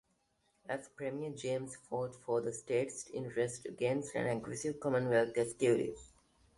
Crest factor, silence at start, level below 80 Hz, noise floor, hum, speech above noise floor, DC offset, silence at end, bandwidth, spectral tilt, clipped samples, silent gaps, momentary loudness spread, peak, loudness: 20 dB; 0.65 s; -70 dBFS; -77 dBFS; none; 41 dB; under 0.1%; 0.5 s; 11.5 kHz; -5.5 dB/octave; under 0.1%; none; 11 LU; -18 dBFS; -37 LUFS